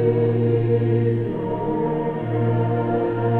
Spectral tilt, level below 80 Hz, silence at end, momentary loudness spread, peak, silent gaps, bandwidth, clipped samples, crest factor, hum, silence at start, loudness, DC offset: -11.5 dB/octave; -46 dBFS; 0 s; 5 LU; -8 dBFS; none; 4 kHz; under 0.1%; 12 dB; none; 0 s; -21 LUFS; under 0.1%